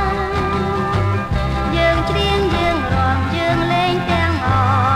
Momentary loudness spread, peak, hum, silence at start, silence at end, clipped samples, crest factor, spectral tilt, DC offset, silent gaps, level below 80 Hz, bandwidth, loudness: 3 LU; -2 dBFS; none; 0 s; 0 s; under 0.1%; 14 dB; -6.5 dB/octave; under 0.1%; none; -28 dBFS; 13 kHz; -17 LUFS